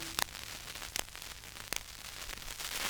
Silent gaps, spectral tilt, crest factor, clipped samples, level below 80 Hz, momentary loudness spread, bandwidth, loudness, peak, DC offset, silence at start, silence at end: none; -0.5 dB/octave; 32 dB; under 0.1%; -54 dBFS; 9 LU; over 20 kHz; -40 LUFS; -10 dBFS; under 0.1%; 0 s; 0 s